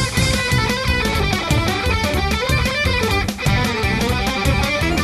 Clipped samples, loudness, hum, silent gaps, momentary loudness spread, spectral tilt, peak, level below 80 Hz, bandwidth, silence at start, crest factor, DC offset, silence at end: under 0.1%; -18 LUFS; none; none; 2 LU; -4.5 dB/octave; -4 dBFS; -26 dBFS; 14 kHz; 0 s; 14 dB; under 0.1%; 0 s